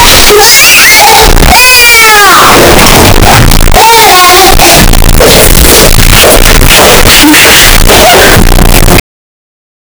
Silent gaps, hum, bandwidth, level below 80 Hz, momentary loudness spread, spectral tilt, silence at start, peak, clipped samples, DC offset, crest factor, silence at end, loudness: none; none; over 20 kHz; -6 dBFS; 5 LU; -2.5 dB/octave; 0 s; 0 dBFS; 90%; under 0.1%; 0 dB; 1 s; 0 LUFS